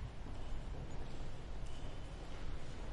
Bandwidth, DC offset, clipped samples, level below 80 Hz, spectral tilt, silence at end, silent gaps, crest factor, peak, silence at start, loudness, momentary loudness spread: 10.5 kHz; under 0.1%; under 0.1%; -46 dBFS; -6 dB/octave; 0 s; none; 12 dB; -30 dBFS; 0 s; -50 LUFS; 2 LU